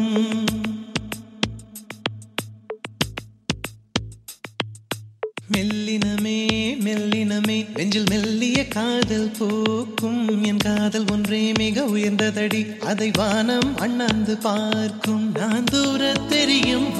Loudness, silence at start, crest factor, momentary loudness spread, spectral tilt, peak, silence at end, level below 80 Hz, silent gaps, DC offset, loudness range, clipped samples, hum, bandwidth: -22 LUFS; 0 s; 20 dB; 11 LU; -4.5 dB/octave; -4 dBFS; 0 s; -48 dBFS; none; under 0.1%; 8 LU; under 0.1%; none; 14 kHz